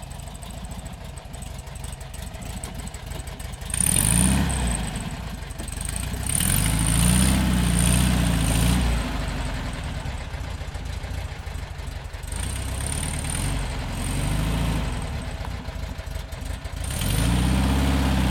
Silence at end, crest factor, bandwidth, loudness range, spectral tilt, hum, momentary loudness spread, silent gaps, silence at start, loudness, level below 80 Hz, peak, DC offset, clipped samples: 0 s; 20 dB; 19 kHz; 11 LU; -4 dB/octave; none; 16 LU; none; 0 s; -25 LUFS; -28 dBFS; -4 dBFS; under 0.1%; under 0.1%